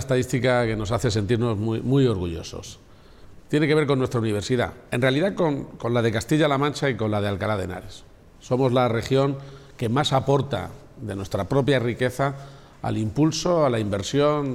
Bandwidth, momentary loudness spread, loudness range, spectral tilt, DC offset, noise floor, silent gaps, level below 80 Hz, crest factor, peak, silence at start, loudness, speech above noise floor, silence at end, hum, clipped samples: 14.5 kHz; 12 LU; 2 LU; -6 dB/octave; under 0.1%; -46 dBFS; none; -48 dBFS; 14 dB; -10 dBFS; 0 s; -23 LUFS; 23 dB; 0 s; none; under 0.1%